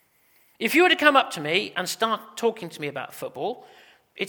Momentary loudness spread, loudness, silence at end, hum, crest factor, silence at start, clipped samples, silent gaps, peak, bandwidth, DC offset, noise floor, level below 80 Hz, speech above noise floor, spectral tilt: 16 LU; -23 LUFS; 0 s; none; 24 dB; 0.6 s; under 0.1%; none; 0 dBFS; over 20 kHz; under 0.1%; -62 dBFS; -74 dBFS; 38 dB; -3 dB/octave